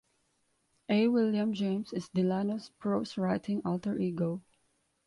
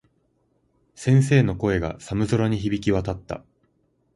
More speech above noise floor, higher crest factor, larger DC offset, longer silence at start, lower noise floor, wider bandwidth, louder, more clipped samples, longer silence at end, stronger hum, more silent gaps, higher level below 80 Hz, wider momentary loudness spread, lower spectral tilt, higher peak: about the same, 44 dB vs 46 dB; about the same, 16 dB vs 18 dB; neither; about the same, 0.9 s vs 1 s; first, -75 dBFS vs -67 dBFS; about the same, 11 kHz vs 11.5 kHz; second, -31 LUFS vs -22 LUFS; neither; second, 0.65 s vs 0.8 s; neither; neither; second, -70 dBFS vs -44 dBFS; second, 8 LU vs 13 LU; about the same, -7.5 dB/octave vs -7 dB/octave; second, -16 dBFS vs -6 dBFS